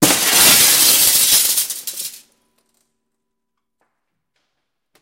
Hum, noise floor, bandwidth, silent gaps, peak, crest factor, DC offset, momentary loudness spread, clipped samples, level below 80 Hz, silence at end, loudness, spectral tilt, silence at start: none; -78 dBFS; 16.5 kHz; none; 0 dBFS; 18 dB; under 0.1%; 18 LU; under 0.1%; -52 dBFS; 2.9 s; -10 LUFS; 0 dB/octave; 0 s